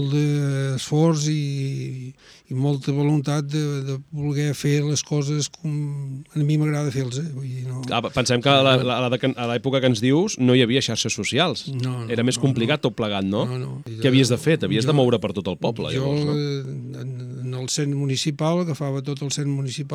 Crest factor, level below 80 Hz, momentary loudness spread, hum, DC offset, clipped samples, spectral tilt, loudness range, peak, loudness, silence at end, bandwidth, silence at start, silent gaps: 20 dB; -58 dBFS; 12 LU; none; under 0.1%; under 0.1%; -5.5 dB/octave; 5 LU; -2 dBFS; -22 LUFS; 0 s; 13.5 kHz; 0 s; none